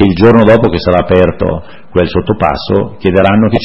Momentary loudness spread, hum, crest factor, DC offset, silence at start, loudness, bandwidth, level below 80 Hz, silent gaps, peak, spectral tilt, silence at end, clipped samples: 10 LU; none; 10 dB; 2%; 0 s; -10 LUFS; 6 kHz; -30 dBFS; none; 0 dBFS; -9 dB/octave; 0 s; 0.9%